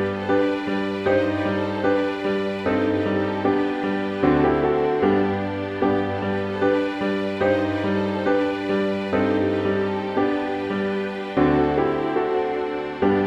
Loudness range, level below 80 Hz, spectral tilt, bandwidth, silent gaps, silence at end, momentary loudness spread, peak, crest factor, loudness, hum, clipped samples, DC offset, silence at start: 1 LU; -48 dBFS; -7.5 dB/octave; 8.4 kHz; none; 0 s; 5 LU; -6 dBFS; 16 dB; -22 LUFS; none; under 0.1%; under 0.1%; 0 s